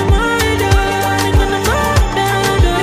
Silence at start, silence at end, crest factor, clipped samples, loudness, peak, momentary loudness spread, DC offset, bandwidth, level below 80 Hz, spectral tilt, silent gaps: 0 s; 0 s; 12 dB; under 0.1%; -14 LUFS; 0 dBFS; 2 LU; under 0.1%; 16 kHz; -18 dBFS; -5 dB/octave; none